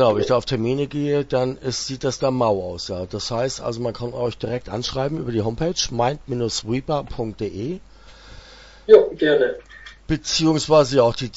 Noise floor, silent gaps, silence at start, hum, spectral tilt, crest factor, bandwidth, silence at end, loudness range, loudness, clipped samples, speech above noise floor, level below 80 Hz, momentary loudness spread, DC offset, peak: -44 dBFS; none; 0 s; none; -5 dB/octave; 20 dB; 8 kHz; 0 s; 6 LU; -21 LUFS; under 0.1%; 23 dB; -44 dBFS; 12 LU; under 0.1%; 0 dBFS